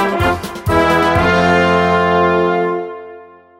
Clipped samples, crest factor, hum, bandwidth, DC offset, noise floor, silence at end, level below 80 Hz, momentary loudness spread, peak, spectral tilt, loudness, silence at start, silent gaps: under 0.1%; 14 dB; none; 16 kHz; under 0.1%; -38 dBFS; 0.35 s; -34 dBFS; 9 LU; -2 dBFS; -6 dB/octave; -13 LUFS; 0 s; none